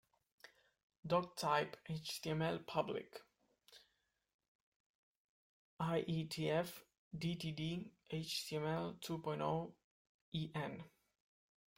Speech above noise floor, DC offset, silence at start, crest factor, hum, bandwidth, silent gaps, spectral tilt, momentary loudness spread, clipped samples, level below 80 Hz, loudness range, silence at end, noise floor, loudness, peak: 42 dB; under 0.1%; 0.45 s; 22 dB; none; 16.5 kHz; 0.84-0.90 s, 0.99-1.03 s, 4.34-4.39 s, 4.48-5.77 s, 6.98-7.11 s, 9.84-10.32 s; -5.5 dB/octave; 12 LU; under 0.1%; -74 dBFS; 6 LU; 0.9 s; -84 dBFS; -42 LUFS; -22 dBFS